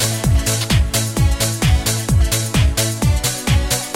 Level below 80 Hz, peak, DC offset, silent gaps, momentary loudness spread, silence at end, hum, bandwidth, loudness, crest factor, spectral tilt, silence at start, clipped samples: -20 dBFS; -4 dBFS; under 0.1%; none; 2 LU; 0 s; none; 17 kHz; -17 LUFS; 12 dB; -4 dB/octave; 0 s; under 0.1%